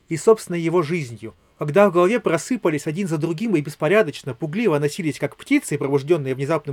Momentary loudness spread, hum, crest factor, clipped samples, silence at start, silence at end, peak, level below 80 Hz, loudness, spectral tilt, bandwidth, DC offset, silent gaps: 10 LU; none; 20 dB; under 0.1%; 0.1 s; 0 s; -2 dBFS; -64 dBFS; -21 LUFS; -6 dB/octave; 16.5 kHz; under 0.1%; none